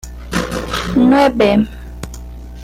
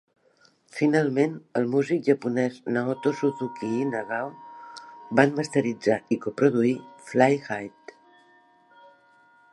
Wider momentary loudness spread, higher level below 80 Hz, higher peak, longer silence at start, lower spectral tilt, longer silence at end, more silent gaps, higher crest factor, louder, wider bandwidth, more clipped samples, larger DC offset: first, 20 LU vs 14 LU; first, -30 dBFS vs -74 dBFS; about the same, -2 dBFS vs -2 dBFS; second, 0.05 s vs 0.75 s; about the same, -5.5 dB/octave vs -6.5 dB/octave; second, 0 s vs 1.85 s; neither; second, 14 dB vs 24 dB; first, -14 LUFS vs -25 LUFS; first, 16 kHz vs 11.5 kHz; neither; neither